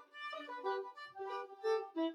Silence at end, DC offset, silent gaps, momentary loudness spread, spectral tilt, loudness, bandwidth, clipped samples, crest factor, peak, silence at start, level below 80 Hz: 0 s; under 0.1%; none; 9 LU; -3 dB/octave; -42 LUFS; 11 kHz; under 0.1%; 16 dB; -26 dBFS; 0 s; under -90 dBFS